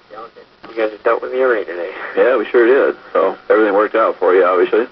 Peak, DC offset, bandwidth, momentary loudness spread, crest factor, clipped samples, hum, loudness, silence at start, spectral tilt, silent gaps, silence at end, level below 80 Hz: -2 dBFS; under 0.1%; 5.6 kHz; 12 LU; 14 dB; under 0.1%; none; -15 LUFS; 0.1 s; -7 dB/octave; none; 0.05 s; -66 dBFS